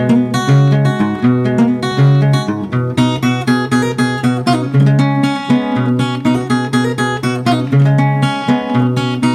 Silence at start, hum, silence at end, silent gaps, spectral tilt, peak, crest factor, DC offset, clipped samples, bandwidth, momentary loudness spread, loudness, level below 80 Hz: 0 s; none; 0 s; none; -7 dB/octave; 0 dBFS; 12 dB; under 0.1%; under 0.1%; 12 kHz; 5 LU; -14 LUFS; -50 dBFS